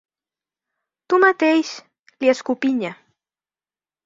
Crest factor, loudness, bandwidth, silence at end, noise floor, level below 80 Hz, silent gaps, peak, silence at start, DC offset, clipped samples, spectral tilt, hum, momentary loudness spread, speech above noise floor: 20 dB; -19 LUFS; 7.8 kHz; 1.1 s; under -90 dBFS; -70 dBFS; 1.99-2.04 s; -2 dBFS; 1.1 s; under 0.1%; under 0.1%; -4 dB/octave; none; 15 LU; over 72 dB